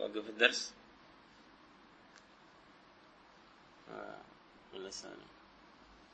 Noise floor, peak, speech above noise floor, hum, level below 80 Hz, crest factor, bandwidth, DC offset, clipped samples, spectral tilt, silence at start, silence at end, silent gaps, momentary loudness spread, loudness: -62 dBFS; -10 dBFS; 24 dB; none; -76 dBFS; 32 dB; 8.4 kHz; under 0.1%; under 0.1%; -1 dB/octave; 0 s; 0.05 s; none; 31 LU; -36 LUFS